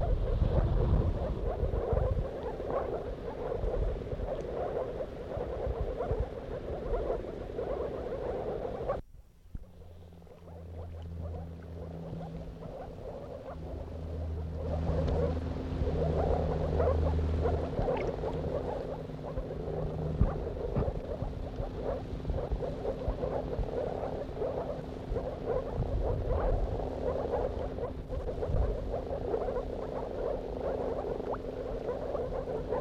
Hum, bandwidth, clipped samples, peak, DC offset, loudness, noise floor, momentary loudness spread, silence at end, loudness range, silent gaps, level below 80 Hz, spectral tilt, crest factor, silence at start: none; 7.6 kHz; under 0.1%; -14 dBFS; under 0.1%; -35 LUFS; -54 dBFS; 12 LU; 0 s; 10 LU; none; -38 dBFS; -9 dB/octave; 20 dB; 0 s